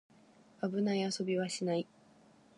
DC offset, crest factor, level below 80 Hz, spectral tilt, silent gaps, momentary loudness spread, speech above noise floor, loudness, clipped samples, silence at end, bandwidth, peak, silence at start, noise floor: under 0.1%; 14 dB; -84 dBFS; -5 dB/octave; none; 6 LU; 29 dB; -35 LUFS; under 0.1%; 0.75 s; 11.5 kHz; -22 dBFS; 0.6 s; -63 dBFS